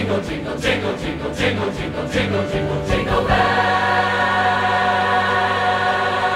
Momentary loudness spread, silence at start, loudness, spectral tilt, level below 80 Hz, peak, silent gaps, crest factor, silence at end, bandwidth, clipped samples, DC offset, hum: 7 LU; 0 s; -18 LUFS; -5 dB/octave; -36 dBFS; -4 dBFS; none; 14 dB; 0 s; 15 kHz; under 0.1%; under 0.1%; none